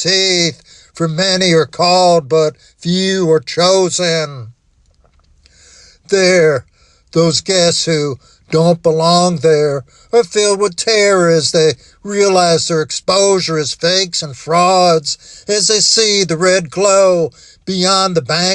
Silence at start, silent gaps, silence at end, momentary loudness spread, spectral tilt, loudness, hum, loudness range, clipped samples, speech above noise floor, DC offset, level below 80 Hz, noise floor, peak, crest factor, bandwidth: 0 s; none; 0 s; 9 LU; -3.5 dB/octave; -12 LUFS; none; 4 LU; under 0.1%; 41 dB; under 0.1%; -52 dBFS; -53 dBFS; 0 dBFS; 12 dB; 11 kHz